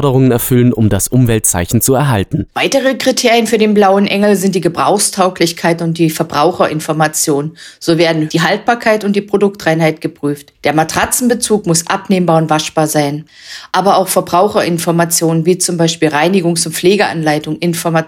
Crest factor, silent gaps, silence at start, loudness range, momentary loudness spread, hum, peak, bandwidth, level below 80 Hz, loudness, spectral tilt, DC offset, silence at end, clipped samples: 12 dB; none; 0 s; 2 LU; 5 LU; none; 0 dBFS; over 20 kHz; -40 dBFS; -12 LUFS; -4.5 dB/octave; under 0.1%; 0 s; under 0.1%